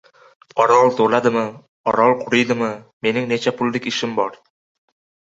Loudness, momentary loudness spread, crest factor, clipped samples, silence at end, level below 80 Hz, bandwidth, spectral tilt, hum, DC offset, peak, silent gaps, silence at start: -18 LUFS; 11 LU; 18 dB; under 0.1%; 1.05 s; -62 dBFS; 8 kHz; -5 dB/octave; none; under 0.1%; -2 dBFS; 1.68-1.84 s, 2.93-3.01 s; 0.55 s